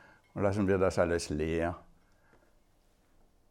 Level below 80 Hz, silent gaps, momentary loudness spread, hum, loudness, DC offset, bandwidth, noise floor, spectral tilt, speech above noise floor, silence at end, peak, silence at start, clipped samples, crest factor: -56 dBFS; none; 11 LU; none; -31 LUFS; under 0.1%; 14.5 kHz; -67 dBFS; -6 dB/octave; 37 dB; 1.7 s; -14 dBFS; 0.35 s; under 0.1%; 20 dB